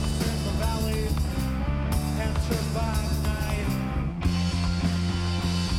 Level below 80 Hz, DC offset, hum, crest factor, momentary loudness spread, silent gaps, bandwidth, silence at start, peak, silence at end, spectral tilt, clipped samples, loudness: -30 dBFS; under 0.1%; none; 14 dB; 2 LU; none; 16 kHz; 0 s; -12 dBFS; 0 s; -5.5 dB/octave; under 0.1%; -27 LUFS